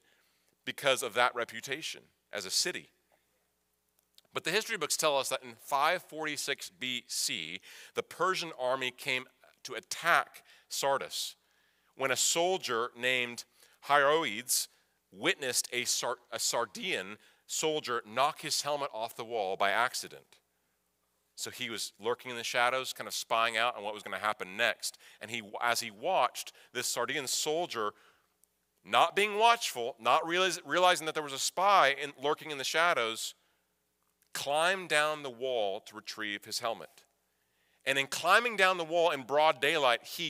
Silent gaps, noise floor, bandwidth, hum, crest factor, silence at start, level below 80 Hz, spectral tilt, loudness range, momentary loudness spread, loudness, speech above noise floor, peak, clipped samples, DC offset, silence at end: none; -78 dBFS; 16 kHz; none; 24 dB; 0.65 s; -88 dBFS; -1 dB/octave; 6 LU; 13 LU; -31 LUFS; 46 dB; -10 dBFS; under 0.1%; under 0.1%; 0 s